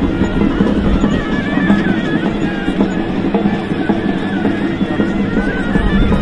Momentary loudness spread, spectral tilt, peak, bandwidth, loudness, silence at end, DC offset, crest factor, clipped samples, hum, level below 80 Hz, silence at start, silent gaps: 3 LU; -7.5 dB/octave; 0 dBFS; 9.6 kHz; -15 LUFS; 0 s; 1%; 14 dB; under 0.1%; none; -24 dBFS; 0 s; none